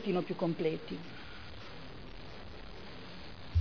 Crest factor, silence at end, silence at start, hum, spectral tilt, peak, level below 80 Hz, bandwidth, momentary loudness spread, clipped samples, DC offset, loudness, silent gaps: 18 dB; 0 s; 0 s; none; -6 dB/octave; -20 dBFS; -56 dBFS; 5.4 kHz; 15 LU; under 0.1%; 0.4%; -40 LUFS; none